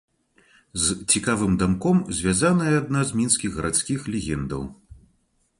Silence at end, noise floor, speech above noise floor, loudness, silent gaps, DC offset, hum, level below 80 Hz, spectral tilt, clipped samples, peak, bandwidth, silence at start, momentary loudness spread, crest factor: 0.65 s; -67 dBFS; 44 dB; -22 LUFS; none; under 0.1%; none; -44 dBFS; -4.5 dB/octave; under 0.1%; -4 dBFS; 11.5 kHz; 0.75 s; 9 LU; 20 dB